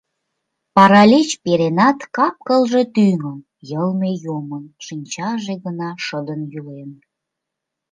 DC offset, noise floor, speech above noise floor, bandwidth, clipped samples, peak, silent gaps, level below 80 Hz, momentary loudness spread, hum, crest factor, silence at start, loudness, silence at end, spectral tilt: under 0.1%; -81 dBFS; 64 dB; 9.4 kHz; under 0.1%; 0 dBFS; none; -64 dBFS; 20 LU; none; 18 dB; 0.75 s; -16 LUFS; 1 s; -5.5 dB/octave